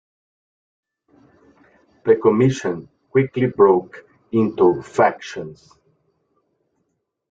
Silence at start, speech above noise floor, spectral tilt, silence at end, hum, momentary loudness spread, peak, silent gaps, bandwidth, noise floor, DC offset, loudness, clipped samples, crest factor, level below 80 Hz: 2.05 s; 55 dB; -7.5 dB/octave; 1.8 s; none; 17 LU; -2 dBFS; none; 7.8 kHz; -73 dBFS; under 0.1%; -18 LUFS; under 0.1%; 20 dB; -60 dBFS